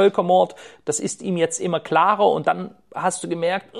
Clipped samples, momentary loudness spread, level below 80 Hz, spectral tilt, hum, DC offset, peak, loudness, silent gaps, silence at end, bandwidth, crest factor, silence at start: under 0.1%; 9 LU; -70 dBFS; -4.5 dB/octave; none; 0.1%; -4 dBFS; -21 LUFS; none; 0 s; 12.5 kHz; 16 dB; 0 s